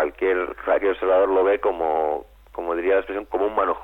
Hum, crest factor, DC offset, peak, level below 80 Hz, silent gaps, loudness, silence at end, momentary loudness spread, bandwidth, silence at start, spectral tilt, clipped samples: 50 Hz at -50 dBFS; 14 dB; under 0.1%; -8 dBFS; -50 dBFS; none; -22 LUFS; 0 s; 9 LU; 4 kHz; 0 s; -6.5 dB/octave; under 0.1%